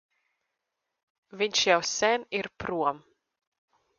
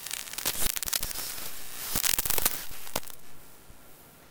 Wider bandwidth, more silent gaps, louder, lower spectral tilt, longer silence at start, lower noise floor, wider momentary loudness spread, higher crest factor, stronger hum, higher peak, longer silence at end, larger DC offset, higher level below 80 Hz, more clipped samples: second, 10 kHz vs 19.5 kHz; neither; about the same, -27 LUFS vs -29 LUFS; first, -2 dB/octave vs -0.5 dB/octave; first, 1.35 s vs 0 s; first, -84 dBFS vs -52 dBFS; second, 10 LU vs 13 LU; second, 22 dB vs 30 dB; neither; second, -8 dBFS vs -2 dBFS; first, 1 s vs 0.05 s; neither; second, -64 dBFS vs -50 dBFS; neither